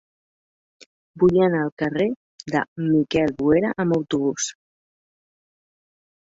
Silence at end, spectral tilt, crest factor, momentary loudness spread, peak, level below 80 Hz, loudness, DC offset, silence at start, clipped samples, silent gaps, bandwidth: 1.8 s; -5.5 dB/octave; 18 dB; 7 LU; -6 dBFS; -54 dBFS; -21 LUFS; under 0.1%; 1.15 s; under 0.1%; 1.72-1.77 s, 2.16-2.39 s, 2.68-2.76 s; 8 kHz